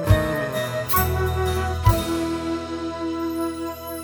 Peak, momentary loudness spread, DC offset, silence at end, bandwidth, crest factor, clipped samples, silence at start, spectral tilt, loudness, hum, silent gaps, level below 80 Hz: -4 dBFS; 8 LU; under 0.1%; 0 s; over 20 kHz; 20 dB; under 0.1%; 0 s; -6 dB/octave; -23 LUFS; none; none; -32 dBFS